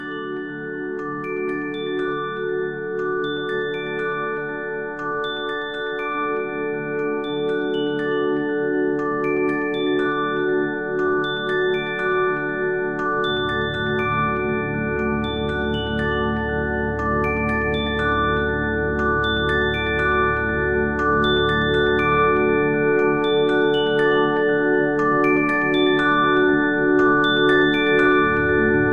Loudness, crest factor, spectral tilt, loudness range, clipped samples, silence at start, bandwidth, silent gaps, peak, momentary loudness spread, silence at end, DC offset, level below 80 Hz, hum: -20 LUFS; 12 dB; -7 dB/octave; 8 LU; under 0.1%; 0 s; 7 kHz; none; -8 dBFS; 9 LU; 0 s; 0.4%; -40 dBFS; none